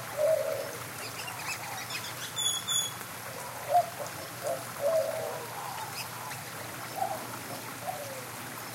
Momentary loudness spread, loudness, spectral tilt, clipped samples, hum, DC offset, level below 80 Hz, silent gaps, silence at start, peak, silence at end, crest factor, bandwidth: 10 LU; -33 LUFS; -2 dB/octave; under 0.1%; none; under 0.1%; -74 dBFS; none; 0 s; -14 dBFS; 0 s; 20 dB; 17 kHz